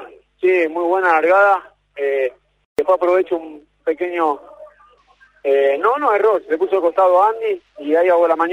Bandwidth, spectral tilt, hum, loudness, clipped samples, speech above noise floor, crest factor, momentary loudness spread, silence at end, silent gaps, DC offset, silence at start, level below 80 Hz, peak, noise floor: 10.5 kHz; -5 dB/octave; none; -17 LUFS; under 0.1%; 37 dB; 16 dB; 12 LU; 0 s; 2.65-2.76 s; under 0.1%; 0 s; -64 dBFS; -2 dBFS; -53 dBFS